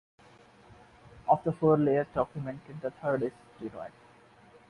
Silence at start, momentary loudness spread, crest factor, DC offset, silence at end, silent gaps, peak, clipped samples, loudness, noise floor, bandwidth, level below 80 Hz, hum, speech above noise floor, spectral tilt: 1.15 s; 18 LU; 20 dB; under 0.1%; 0.8 s; none; -12 dBFS; under 0.1%; -30 LUFS; -58 dBFS; 10.5 kHz; -62 dBFS; none; 28 dB; -9.5 dB/octave